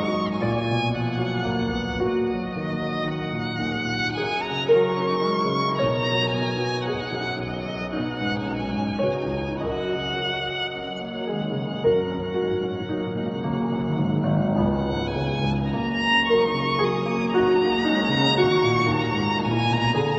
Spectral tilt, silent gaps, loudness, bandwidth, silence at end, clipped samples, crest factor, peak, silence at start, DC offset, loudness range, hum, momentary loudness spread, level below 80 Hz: -6.5 dB/octave; none; -24 LUFS; 8 kHz; 0 s; under 0.1%; 16 dB; -8 dBFS; 0 s; under 0.1%; 5 LU; none; 8 LU; -44 dBFS